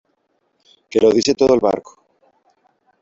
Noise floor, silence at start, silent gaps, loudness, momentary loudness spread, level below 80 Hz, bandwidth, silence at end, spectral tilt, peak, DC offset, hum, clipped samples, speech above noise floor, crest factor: -67 dBFS; 0.95 s; none; -16 LUFS; 7 LU; -52 dBFS; 7.8 kHz; 1.2 s; -4.5 dB/octave; -2 dBFS; under 0.1%; none; under 0.1%; 52 dB; 16 dB